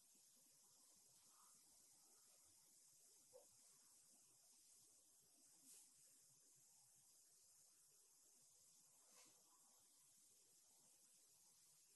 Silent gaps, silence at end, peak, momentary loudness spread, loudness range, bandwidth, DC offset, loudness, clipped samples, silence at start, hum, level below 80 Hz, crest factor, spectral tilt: none; 0 s; -54 dBFS; 4 LU; 1 LU; 12 kHz; under 0.1%; -69 LUFS; under 0.1%; 0 s; none; under -90 dBFS; 20 dB; -0.5 dB/octave